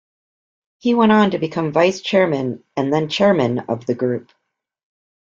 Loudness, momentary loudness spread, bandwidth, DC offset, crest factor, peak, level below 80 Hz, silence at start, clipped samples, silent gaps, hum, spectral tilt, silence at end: -18 LUFS; 10 LU; 7.6 kHz; under 0.1%; 18 dB; -2 dBFS; -60 dBFS; 0.85 s; under 0.1%; none; none; -6.5 dB/octave; 1.1 s